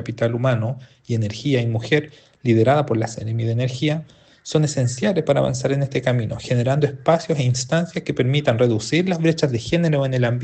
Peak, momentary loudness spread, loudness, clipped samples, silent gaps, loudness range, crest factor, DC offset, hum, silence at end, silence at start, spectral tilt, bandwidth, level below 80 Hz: -2 dBFS; 6 LU; -20 LUFS; under 0.1%; none; 2 LU; 18 dB; under 0.1%; none; 0 s; 0 s; -6 dB/octave; 9 kHz; -52 dBFS